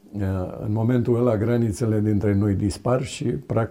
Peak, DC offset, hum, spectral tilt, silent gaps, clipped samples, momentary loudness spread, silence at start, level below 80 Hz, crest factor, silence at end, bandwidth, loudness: -8 dBFS; under 0.1%; none; -7.5 dB/octave; none; under 0.1%; 6 LU; 0.15 s; -48 dBFS; 14 dB; 0 s; 13 kHz; -23 LUFS